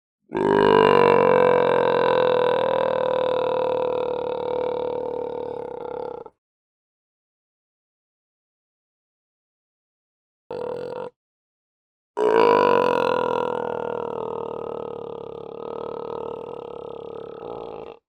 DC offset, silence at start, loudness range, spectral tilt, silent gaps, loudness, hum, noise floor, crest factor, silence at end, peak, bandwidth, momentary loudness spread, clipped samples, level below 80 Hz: under 0.1%; 0.3 s; 19 LU; -6.5 dB/octave; 6.38-10.50 s, 11.16-12.14 s; -22 LUFS; none; under -90 dBFS; 22 dB; 0.15 s; -2 dBFS; 8.8 kHz; 19 LU; under 0.1%; -60 dBFS